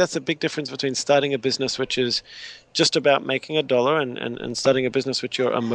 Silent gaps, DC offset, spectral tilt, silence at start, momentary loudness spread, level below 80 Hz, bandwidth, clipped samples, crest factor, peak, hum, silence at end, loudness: none; under 0.1%; -3.5 dB/octave; 0 s; 8 LU; -60 dBFS; 10.5 kHz; under 0.1%; 18 dB; -4 dBFS; none; 0 s; -22 LUFS